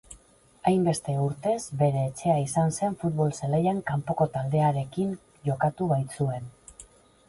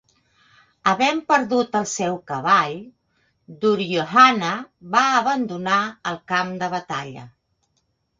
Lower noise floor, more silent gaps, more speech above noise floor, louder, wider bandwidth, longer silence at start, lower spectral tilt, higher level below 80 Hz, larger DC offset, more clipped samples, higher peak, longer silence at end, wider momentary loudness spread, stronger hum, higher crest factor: second, -58 dBFS vs -70 dBFS; neither; second, 32 dB vs 50 dB; second, -27 LUFS vs -20 LUFS; first, 11.5 kHz vs 9.4 kHz; second, 0.1 s vs 0.85 s; first, -7 dB/octave vs -4 dB/octave; first, -58 dBFS vs -66 dBFS; neither; neither; second, -10 dBFS vs 0 dBFS; second, 0.45 s vs 0.9 s; second, 6 LU vs 15 LU; neither; about the same, 18 dB vs 22 dB